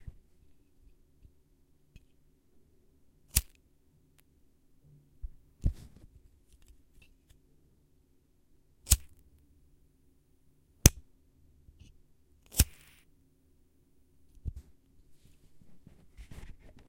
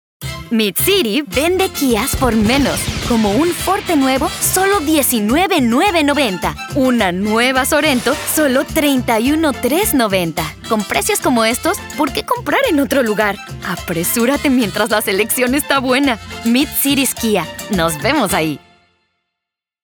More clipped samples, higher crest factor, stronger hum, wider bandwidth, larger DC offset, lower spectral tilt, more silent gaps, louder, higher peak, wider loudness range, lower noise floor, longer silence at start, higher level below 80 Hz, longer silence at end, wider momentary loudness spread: neither; first, 38 dB vs 16 dB; neither; second, 16 kHz vs over 20 kHz; neither; about the same, -3 dB/octave vs -3.5 dB/octave; neither; second, -30 LUFS vs -15 LUFS; about the same, 0 dBFS vs 0 dBFS; first, 14 LU vs 2 LU; second, -67 dBFS vs -82 dBFS; first, 3.35 s vs 0.2 s; second, -42 dBFS vs -36 dBFS; second, 0.4 s vs 1.25 s; first, 29 LU vs 6 LU